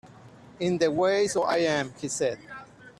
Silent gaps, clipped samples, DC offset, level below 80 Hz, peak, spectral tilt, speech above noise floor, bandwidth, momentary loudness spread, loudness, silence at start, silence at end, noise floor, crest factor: none; under 0.1%; under 0.1%; -64 dBFS; -12 dBFS; -4 dB/octave; 24 dB; 13 kHz; 15 LU; -26 LUFS; 0.05 s; 0.1 s; -50 dBFS; 16 dB